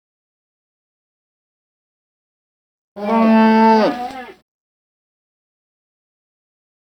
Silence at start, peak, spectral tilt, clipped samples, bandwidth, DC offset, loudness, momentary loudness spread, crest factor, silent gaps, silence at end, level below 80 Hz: 2.95 s; -4 dBFS; -7 dB/octave; under 0.1%; 6.4 kHz; under 0.1%; -13 LUFS; 17 LU; 18 dB; none; 2.65 s; -62 dBFS